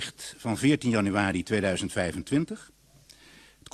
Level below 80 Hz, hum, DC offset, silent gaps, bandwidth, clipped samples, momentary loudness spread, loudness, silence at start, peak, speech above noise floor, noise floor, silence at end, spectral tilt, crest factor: -56 dBFS; none; under 0.1%; none; 13 kHz; under 0.1%; 12 LU; -27 LUFS; 0 s; -10 dBFS; 29 dB; -56 dBFS; 1.1 s; -5 dB/octave; 18 dB